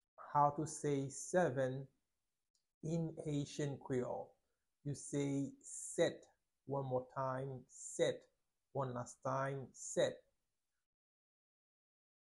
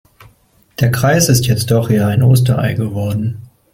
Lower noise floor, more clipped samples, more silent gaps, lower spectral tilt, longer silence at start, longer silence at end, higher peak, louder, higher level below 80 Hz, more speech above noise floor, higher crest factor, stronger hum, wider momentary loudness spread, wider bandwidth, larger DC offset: first, under -90 dBFS vs -52 dBFS; neither; first, 2.50-2.54 s, 2.74-2.81 s vs none; about the same, -5.5 dB/octave vs -5.5 dB/octave; second, 0.2 s vs 0.8 s; first, 2.1 s vs 0.3 s; second, -20 dBFS vs 0 dBFS; second, -41 LUFS vs -14 LUFS; second, -76 dBFS vs -42 dBFS; first, over 50 dB vs 40 dB; first, 22 dB vs 14 dB; neither; about the same, 12 LU vs 10 LU; second, 11.5 kHz vs 16.5 kHz; neither